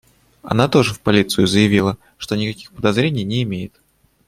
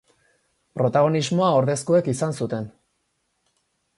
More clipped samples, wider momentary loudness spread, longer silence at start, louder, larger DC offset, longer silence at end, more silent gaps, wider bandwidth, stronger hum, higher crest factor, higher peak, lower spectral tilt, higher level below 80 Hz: neither; about the same, 11 LU vs 12 LU; second, 0.45 s vs 0.75 s; first, -18 LUFS vs -22 LUFS; neither; second, 0.6 s vs 1.3 s; neither; first, 16 kHz vs 11.5 kHz; neither; about the same, 16 dB vs 16 dB; first, -2 dBFS vs -8 dBFS; about the same, -5.5 dB/octave vs -6 dB/octave; first, -48 dBFS vs -62 dBFS